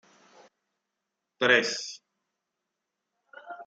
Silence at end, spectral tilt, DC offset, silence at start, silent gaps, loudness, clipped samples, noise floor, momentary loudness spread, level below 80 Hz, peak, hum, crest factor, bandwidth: 0.05 s; -2 dB/octave; under 0.1%; 1.4 s; none; -25 LUFS; under 0.1%; -85 dBFS; 23 LU; -88 dBFS; -6 dBFS; none; 26 dB; 9.2 kHz